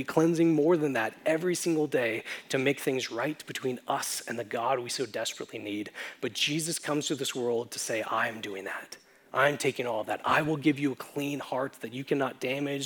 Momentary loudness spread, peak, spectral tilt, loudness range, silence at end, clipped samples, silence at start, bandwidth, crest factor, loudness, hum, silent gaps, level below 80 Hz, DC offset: 11 LU; -10 dBFS; -4 dB/octave; 3 LU; 0 s; under 0.1%; 0 s; over 20 kHz; 20 dB; -30 LUFS; none; none; -76 dBFS; under 0.1%